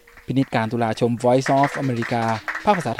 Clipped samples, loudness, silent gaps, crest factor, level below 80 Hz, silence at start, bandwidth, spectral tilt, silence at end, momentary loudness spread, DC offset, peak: under 0.1%; -21 LUFS; none; 16 dB; -54 dBFS; 0.15 s; 15.5 kHz; -6.5 dB/octave; 0 s; 6 LU; under 0.1%; -4 dBFS